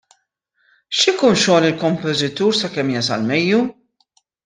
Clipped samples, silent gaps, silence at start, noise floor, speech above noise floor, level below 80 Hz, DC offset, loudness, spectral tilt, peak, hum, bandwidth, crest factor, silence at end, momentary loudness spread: under 0.1%; none; 0.9 s; -67 dBFS; 51 dB; -60 dBFS; under 0.1%; -17 LUFS; -4 dB/octave; -2 dBFS; none; 10 kHz; 16 dB; 0.75 s; 6 LU